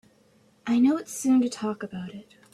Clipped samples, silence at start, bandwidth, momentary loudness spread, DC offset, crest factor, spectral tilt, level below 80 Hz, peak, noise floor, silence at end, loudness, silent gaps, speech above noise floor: under 0.1%; 0.65 s; 13.5 kHz; 17 LU; under 0.1%; 14 dB; -5 dB/octave; -68 dBFS; -12 dBFS; -61 dBFS; 0.3 s; -25 LUFS; none; 36 dB